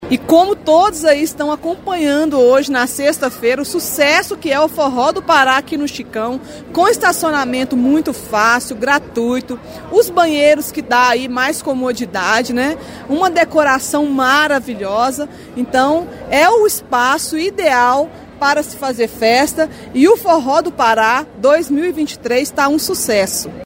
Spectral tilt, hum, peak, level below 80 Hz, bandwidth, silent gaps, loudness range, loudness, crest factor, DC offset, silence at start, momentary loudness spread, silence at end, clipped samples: -3 dB/octave; none; 0 dBFS; -48 dBFS; 16.5 kHz; none; 1 LU; -14 LUFS; 14 dB; under 0.1%; 0 s; 8 LU; 0 s; under 0.1%